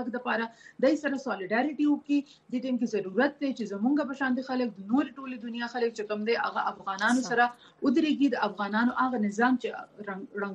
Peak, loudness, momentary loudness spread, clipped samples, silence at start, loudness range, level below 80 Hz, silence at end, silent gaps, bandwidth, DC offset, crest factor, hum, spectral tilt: -12 dBFS; -29 LUFS; 9 LU; under 0.1%; 0 s; 3 LU; -76 dBFS; 0 s; none; 11 kHz; under 0.1%; 16 dB; none; -5 dB/octave